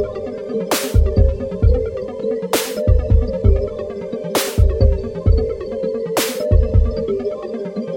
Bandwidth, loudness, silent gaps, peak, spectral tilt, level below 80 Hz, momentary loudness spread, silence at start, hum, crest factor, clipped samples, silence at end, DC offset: 17 kHz; -19 LUFS; none; -2 dBFS; -6 dB/octave; -20 dBFS; 9 LU; 0 s; none; 14 dB; under 0.1%; 0 s; under 0.1%